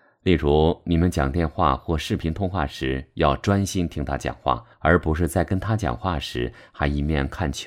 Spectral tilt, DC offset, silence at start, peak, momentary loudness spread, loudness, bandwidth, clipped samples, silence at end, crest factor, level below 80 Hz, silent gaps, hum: -6.5 dB/octave; under 0.1%; 0.25 s; -4 dBFS; 7 LU; -23 LUFS; 15.5 kHz; under 0.1%; 0 s; 20 dB; -34 dBFS; none; none